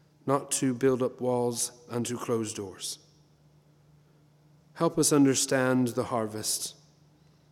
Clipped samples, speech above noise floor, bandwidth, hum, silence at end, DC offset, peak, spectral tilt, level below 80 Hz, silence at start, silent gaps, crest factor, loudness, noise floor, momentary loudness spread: under 0.1%; 33 dB; 17 kHz; none; 0.8 s; under 0.1%; -10 dBFS; -4 dB/octave; -70 dBFS; 0.25 s; none; 18 dB; -28 LUFS; -61 dBFS; 13 LU